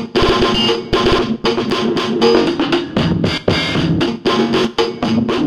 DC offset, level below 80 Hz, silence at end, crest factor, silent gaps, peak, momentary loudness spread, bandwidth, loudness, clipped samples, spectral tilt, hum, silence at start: under 0.1%; -32 dBFS; 0 s; 14 dB; none; 0 dBFS; 4 LU; 12.5 kHz; -15 LUFS; under 0.1%; -5.5 dB/octave; none; 0 s